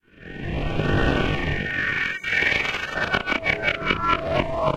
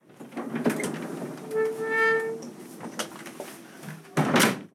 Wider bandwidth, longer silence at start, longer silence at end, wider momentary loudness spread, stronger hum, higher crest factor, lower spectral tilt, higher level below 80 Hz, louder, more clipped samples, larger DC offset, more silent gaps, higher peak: second, 14 kHz vs 17.5 kHz; about the same, 0.2 s vs 0.1 s; about the same, 0 s vs 0.05 s; second, 6 LU vs 19 LU; neither; about the same, 20 dB vs 24 dB; first, -5.5 dB/octave vs -4 dB/octave; first, -34 dBFS vs -74 dBFS; first, -23 LUFS vs -27 LUFS; neither; neither; neither; about the same, -4 dBFS vs -6 dBFS